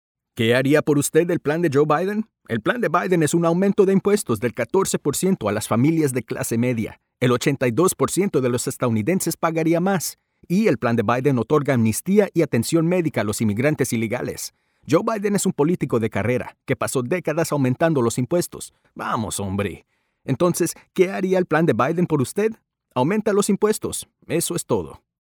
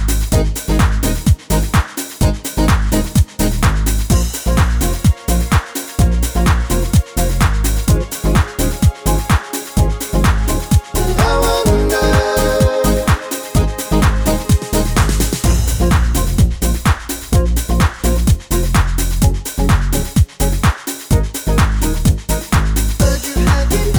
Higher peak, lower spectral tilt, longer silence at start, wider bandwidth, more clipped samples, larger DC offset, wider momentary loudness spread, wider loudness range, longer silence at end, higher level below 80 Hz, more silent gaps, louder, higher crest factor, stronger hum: about the same, -4 dBFS vs -2 dBFS; about the same, -5.5 dB/octave vs -5 dB/octave; first, 0.35 s vs 0 s; about the same, over 20 kHz vs over 20 kHz; neither; neither; first, 8 LU vs 4 LU; about the same, 3 LU vs 2 LU; first, 0.3 s vs 0 s; second, -56 dBFS vs -16 dBFS; neither; second, -21 LUFS vs -16 LUFS; first, 18 dB vs 12 dB; neither